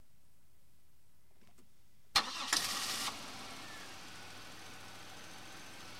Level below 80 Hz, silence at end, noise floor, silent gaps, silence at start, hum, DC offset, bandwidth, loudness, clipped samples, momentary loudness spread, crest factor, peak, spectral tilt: -70 dBFS; 0 s; -71 dBFS; none; 1.55 s; none; 0.2%; 16 kHz; -36 LUFS; under 0.1%; 17 LU; 30 dB; -14 dBFS; 0 dB/octave